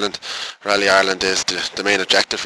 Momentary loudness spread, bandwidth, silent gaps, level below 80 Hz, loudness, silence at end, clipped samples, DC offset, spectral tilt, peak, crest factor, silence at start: 11 LU; 11 kHz; none; -52 dBFS; -17 LUFS; 0 s; under 0.1%; under 0.1%; -1.5 dB/octave; -2 dBFS; 16 dB; 0 s